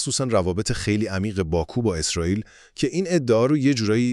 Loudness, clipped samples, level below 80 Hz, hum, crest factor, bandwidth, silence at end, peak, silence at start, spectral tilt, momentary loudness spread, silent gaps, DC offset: -22 LUFS; under 0.1%; -42 dBFS; none; 16 dB; 12 kHz; 0 s; -6 dBFS; 0 s; -5 dB/octave; 6 LU; none; under 0.1%